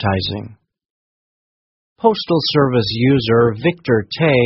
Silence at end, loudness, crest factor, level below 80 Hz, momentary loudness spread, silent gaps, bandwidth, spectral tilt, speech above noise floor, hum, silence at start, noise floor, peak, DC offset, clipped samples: 0 s; -16 LUFS; 16 dB; -48 dBFS; 6 LU; 0.90-1.96 s; 6 kHz; -5 dB/octave; over 75 dB; none; 0 s; under -90 dBFS; 0 dBFS; under 0.1%; under 0.1%